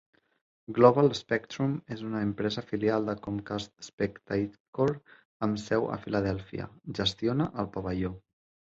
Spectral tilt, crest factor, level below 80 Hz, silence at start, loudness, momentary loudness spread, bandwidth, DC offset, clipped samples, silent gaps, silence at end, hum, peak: -6.5 dB/octave; 24 dB; -56 dBFS; 0.7 s; -30 LUFS; 11 LU; 7.8 kHz; under 0.1%; under 0.1%; 3.93-3.98 s, 4.60-4.73 s, 5.25-5.40 s; 0.55 s; none; -6 dBFS